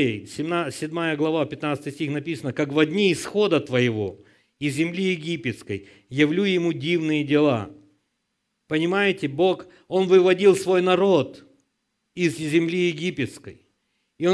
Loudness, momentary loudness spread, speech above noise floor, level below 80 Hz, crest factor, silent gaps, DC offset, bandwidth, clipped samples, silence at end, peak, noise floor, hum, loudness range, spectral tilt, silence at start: -23 LUFS; 12 LU; 54 dB; -66 dBFS; 18 dB; none; under 0.1%; 11 kHz; under 0.1%; 0 s; -4 dBFS; -76 dBFS; none; 4 LU; -6 dB/octave; 0 s